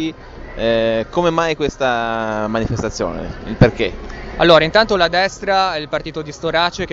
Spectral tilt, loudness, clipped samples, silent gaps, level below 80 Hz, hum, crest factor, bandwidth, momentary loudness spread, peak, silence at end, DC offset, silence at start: -5.5 dB/octave; -17 LUFS; under 0.1%; none; -34 dBFS; none; 18 dB; 8 kHz; 15 LU; 0 dBFS; 0 s; under 0.1%; 0 s